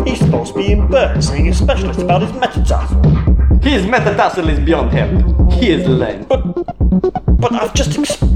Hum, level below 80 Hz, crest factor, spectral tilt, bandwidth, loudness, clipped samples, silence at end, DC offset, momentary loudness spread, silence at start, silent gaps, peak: none; -16 dBFS; 12 dB; -6.5 dB/octave; 11 kHz; -14 LUFS; under 0.1%; 0 s; under 0.1%; 4 LU; 0 s; none; 0 dBFS